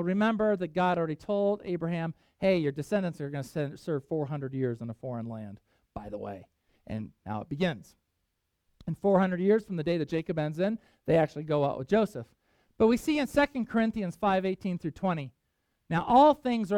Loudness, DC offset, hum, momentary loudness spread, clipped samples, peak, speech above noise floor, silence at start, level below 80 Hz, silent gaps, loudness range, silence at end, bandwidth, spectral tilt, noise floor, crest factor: -29 LUFS; under 0.1%; none; 14 LU; under 0.1%; -10 dBFS; 51 dB; 0 s; -58 dBFS; none; 10 LU; 0 s; 15.5 kHz; -7.5 dB/octave; -80 dBFS; 18 dB